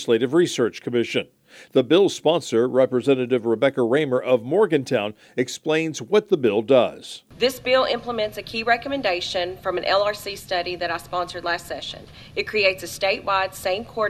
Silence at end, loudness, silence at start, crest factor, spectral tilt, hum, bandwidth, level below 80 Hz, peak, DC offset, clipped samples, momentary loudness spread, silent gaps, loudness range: 0 s; -22 LUFS; 0 s; 18 dB; -4.5 dB/octave; none; 15 kHz; -56 dBFS; -4 dBFS; under 0.1%; under 0.1%; 8 LU; none; 4 LU